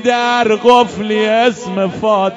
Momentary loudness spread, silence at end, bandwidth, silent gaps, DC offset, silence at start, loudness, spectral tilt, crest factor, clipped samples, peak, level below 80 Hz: 7 LU; 0 s; 11 kHz; none; under 0.1%; 0 s; -13 LUFS; -4.5 dB/octave; 12 dB; 0.3%; 0 dBFS; -52 dBFS